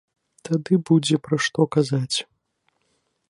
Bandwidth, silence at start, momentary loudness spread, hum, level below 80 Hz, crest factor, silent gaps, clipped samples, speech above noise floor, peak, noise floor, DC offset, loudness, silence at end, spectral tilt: 11.5 kHz; 0.45 s; 8 LU; none; -68 dBFS; 18 dB; none; under 0.1%; 50 dB; -6 dBFS; -71 dBFS; under 0.1%; -22 LUFS; 1.05 s; -5.5 dB/octave